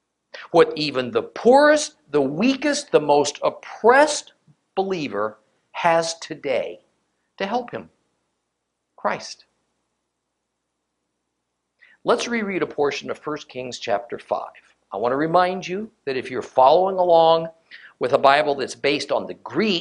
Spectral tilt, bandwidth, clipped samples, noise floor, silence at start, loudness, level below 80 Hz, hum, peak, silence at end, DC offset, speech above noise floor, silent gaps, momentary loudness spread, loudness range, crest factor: -4 dB/octave; 11 kHz; under 0.1%; -77 dBFS; 0.35 s; -21 LUFS; -66 dBFS; none; 0 dBFS; 0 s; under 0.1%; 57 dB; none; 15 LU; 13 LU; 22 dB